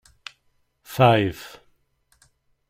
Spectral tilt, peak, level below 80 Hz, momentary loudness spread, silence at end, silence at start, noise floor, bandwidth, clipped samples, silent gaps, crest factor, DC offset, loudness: -6.5 dB/octave; -2 dBFS; -56 dBFS; 25 LU; 1.25 s; 0.9 s; -67 dBFS; 16 kHz; under 0.1%; none; 22 dB; under 0.1%; -19 LUFS